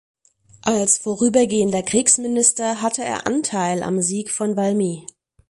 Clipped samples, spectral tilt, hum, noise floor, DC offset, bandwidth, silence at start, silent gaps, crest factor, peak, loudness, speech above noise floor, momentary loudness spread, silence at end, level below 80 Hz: under 0.1%; -3.5 dB/octave; none; -51 dBFS; under 0.1%; 11.5 kHz; 0.65 s; none; 18 dB; -4 dBFS; -19 LUFS; 31 dB; 7 LU; 0.5 s; -58 dBFS